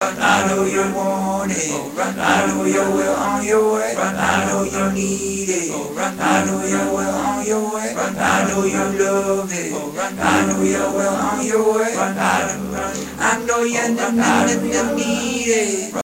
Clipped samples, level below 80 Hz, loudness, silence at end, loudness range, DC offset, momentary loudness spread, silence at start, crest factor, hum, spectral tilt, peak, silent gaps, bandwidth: under 0.1%; -46 dBFS; -18 LUFS; 0 s; 1 LU; under 0.1%; 6 LU; 0 s; 18 dB; none; -4 dB/octave; 0 dBFS; none; 16 kHz